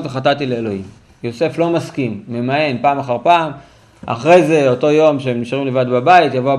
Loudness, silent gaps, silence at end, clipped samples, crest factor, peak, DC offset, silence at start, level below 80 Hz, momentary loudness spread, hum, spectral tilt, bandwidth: -15 LUFS; none; 0 s; under 0.1%; 14 dB; 0 dBFS; under 0.1%; 0 s; -56 dBFS; 13 LU; none; -6.5 dB/octave; 11.5 kHz